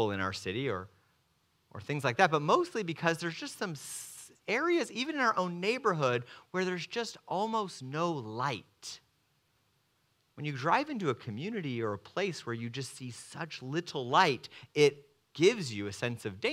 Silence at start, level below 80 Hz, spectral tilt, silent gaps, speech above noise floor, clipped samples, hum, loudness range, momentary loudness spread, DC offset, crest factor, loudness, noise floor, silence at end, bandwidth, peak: 0 s; -78 dBFS; -4.5 dB/octave; none; 41 dB; under 0.1%; none; 6 LU; 14 LU; under 0.1%; 24 dB; -32 LUFS; -74 dBFS; 0 s; 15.5 kHz; -8 dBFS